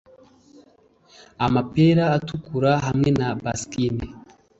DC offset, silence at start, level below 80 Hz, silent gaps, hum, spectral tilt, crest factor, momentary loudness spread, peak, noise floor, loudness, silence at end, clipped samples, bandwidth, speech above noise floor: under 0.1%; 1.4 s; -46 dBFS; none; none; -6.5 dB/octave; 18 dB; 10 LU; -6 dBFS; -56 dBFS; -22 LUFS; 0.4 s; under 0.1%; 8.2 kHz; 36 dB